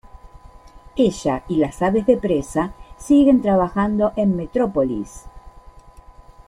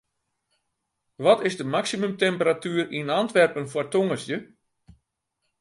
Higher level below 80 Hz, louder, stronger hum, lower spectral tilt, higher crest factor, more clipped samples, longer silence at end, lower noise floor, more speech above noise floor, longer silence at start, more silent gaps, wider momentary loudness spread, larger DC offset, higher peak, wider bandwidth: first, -42 dBFS vs -68 dBFS; first, -19 LUFS vs -24 LUFS; neither; first, -7 dB/octave vs -5 dB/octave; about the same, 16 dB vs 20 dB; neither; second, 0.15 s vs 1.15 s; second, -44 dBFS vs -78 dBFS; second, 26 dB vs 55 dB; second, 0.25 s vs 1.2 s; neither; first, 12 LU vs 8 LU; neither; about the same, -4 dBFS vs -6 dBFS; about the same, 11.5 kHz vs 11.5 kHz